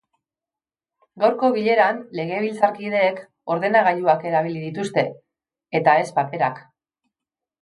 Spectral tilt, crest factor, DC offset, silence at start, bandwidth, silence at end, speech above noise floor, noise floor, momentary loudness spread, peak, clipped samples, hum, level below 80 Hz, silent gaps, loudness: -6 dB/octave; 20 dB; under 0.1%; 1.15 s; 11.5 kHz; 1 s; over 70 dB; under -90 dBFS; 10 LU; -2 dBFS; under 0.1%; none; -72 dBFS; none; -21 LUFS